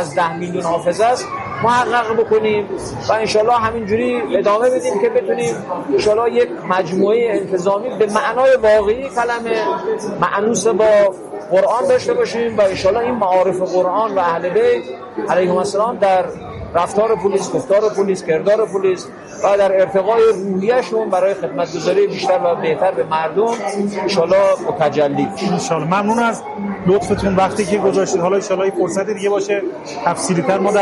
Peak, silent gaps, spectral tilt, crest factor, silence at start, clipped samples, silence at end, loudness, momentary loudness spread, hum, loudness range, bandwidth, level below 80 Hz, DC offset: 0 dBFS; none; -5 dB/octave; 16 dB; 0 s; under 0.1%; 0 s; -16 LUFS; 6 LU; none; 2 LU; 11.5 kHz; -48 dBFS; under 0.1%